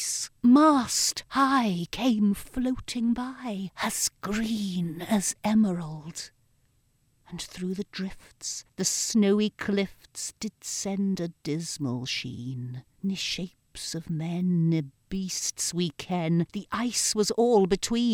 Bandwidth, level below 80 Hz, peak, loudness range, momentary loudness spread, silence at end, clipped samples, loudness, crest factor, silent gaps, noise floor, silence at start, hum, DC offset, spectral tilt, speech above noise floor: 17 kHz; -54 dBFS; -10 dBFS; 6 LU; 13 LU; 0 s; under 0.1%; -27 LUFS; 18 dB; none; -67 dBFS; 0 s; none; under 0.1%; -4.5 dB/octave; 40 dB